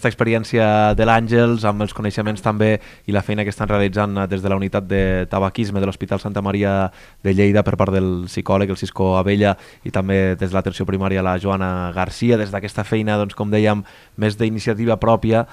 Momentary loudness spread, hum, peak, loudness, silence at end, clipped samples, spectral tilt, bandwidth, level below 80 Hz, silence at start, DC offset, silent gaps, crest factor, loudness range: 7 LU; none; 0 dBFS; -19 LUFS; 0.05 s; under 0.1%; -7.5 dB/octave; 13 kHz; -38 dBFS; 0 s; under 0.1%; none; 18 dB; 2 LU